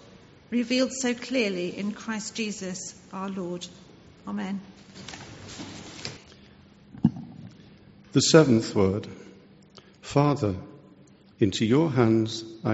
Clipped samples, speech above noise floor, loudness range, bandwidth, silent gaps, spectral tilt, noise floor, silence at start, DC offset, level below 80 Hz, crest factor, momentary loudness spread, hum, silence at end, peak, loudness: under 0.1%; 29 dB; 13 LU; 8 kHz; none; -5.5 dB/octave; -54 dBFS; 0.5 s; under 0.1%; -60 dBFS; 24 dB; 20 LU; none; 0 s; -4 dBFS; -26 LUFS